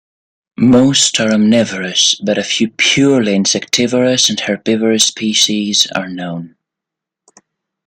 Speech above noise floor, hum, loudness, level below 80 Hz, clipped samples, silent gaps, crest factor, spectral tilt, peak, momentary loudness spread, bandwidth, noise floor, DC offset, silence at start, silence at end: 69 dB; none; -12 LUFS; -54 dBFS; under 0.1%; none; 14 dB; -3 dB/octave; 0 dBFS; 6 LU; 16 kHz; -82 dBFS; under 0.1%; 0.6 s; 1.4 s